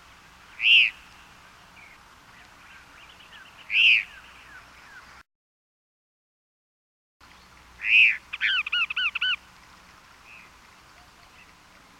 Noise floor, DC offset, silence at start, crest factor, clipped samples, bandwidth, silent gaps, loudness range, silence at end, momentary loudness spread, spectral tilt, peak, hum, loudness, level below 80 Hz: -53 dBFS; under 0.1%; 0.6 s; 20 dB; under 0.1%; 15.5 kHz; 5.35-7.20 s; 5 LU; 2.65 s; 10 LU; 0.5 dB/octave; -10 dBFS; none; -20 LUFS; -64 dBFS